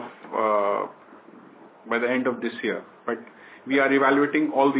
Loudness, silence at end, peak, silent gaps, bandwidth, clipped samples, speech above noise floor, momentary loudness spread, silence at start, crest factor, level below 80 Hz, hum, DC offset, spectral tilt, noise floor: -24 LUFS; 0 s; -8 dBFS; none; 4 kHz; under 0.1%; 25 dB; 13 LU; 0 s; 18 dB; -82 dBFS; none; under 0.1%; -9 dB/octave; -48 dBFS